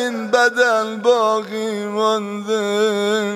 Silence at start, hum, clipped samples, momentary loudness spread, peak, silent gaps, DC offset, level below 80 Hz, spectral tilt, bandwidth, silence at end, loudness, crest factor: 0 s; none; under 0.1%; 7 LU; -2 dBFS; none; under 0.1%; -74 dBFS; -3.5 dB/octave; 16 kHz; 0 s; -18 LUFS; 16 dB